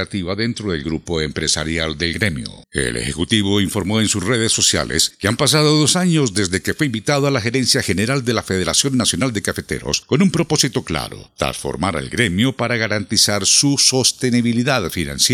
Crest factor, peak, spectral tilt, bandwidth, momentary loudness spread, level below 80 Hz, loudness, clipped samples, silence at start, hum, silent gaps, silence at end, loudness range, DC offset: 18 dB; 0 dBFS; -3.5 dB/octave; 17 kHz; 9 LU; -42 dBFS; -17 LUFS; under 0.1%; 0 s; none; none; 0 s; 4 LU; under 0.1%